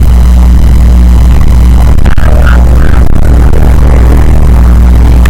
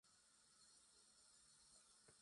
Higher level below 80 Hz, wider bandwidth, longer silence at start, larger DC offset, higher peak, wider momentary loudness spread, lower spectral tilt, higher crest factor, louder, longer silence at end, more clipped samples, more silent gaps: first, -2 dBFS vs under -90 dBFS; about the same, 12 kHz vs 11 kHz; about the same, 0 s vs 0.05 s; neither; first, 0 dBFS vs -54 dBFS; about the same, 2 LU vs 1 LU; first, -7.5 dB/octave vs -0.5 dB/octave; second, 2 dB vs 18 dB; first, -6 LUFS vs -69 LUFS; about the same, 0 s vs 0 s; first, 70% vs under 0.1%; neither